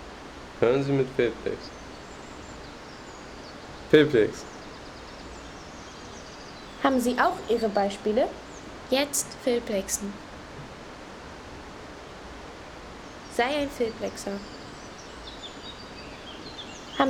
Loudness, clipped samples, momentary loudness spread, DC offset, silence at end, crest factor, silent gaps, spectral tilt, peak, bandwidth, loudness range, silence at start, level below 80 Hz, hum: -27 LUFS; under 0.1%; 18 LU; under 0.1%; 0 s; 24 dB; none; -4 dB/octave; -6 dBFS; 18.5 kHz; 9 LU; 0 s; -52 dBFS; none